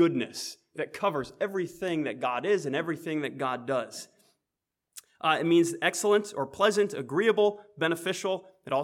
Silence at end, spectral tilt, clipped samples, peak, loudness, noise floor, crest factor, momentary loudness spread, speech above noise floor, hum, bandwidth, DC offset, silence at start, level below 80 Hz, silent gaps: 0 s; -4.5 dB/octave; under 0.1%; -8 dBFS; -28 LUFS; -87 dBFS; 20 dB; 11 LU; 59 dB; none; 16 kHz; under 0.1%; 0 s; -74 dBFS; none